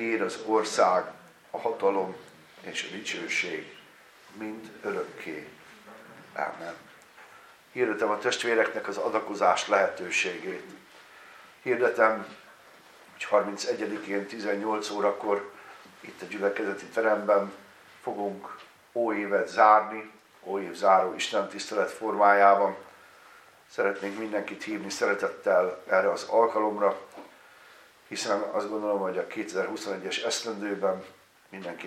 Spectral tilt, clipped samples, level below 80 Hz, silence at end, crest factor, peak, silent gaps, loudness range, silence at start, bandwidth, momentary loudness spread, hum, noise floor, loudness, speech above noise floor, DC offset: -3.5 dB/octave; under 0.1%; -82 dBFS; 0 s; 24 dB; -6 dBFS; none; 9 LU; 0 s; 15 kHz; 18 LU; none; -54 dBFS; -27 LUFS; 27 dB; under 0.1%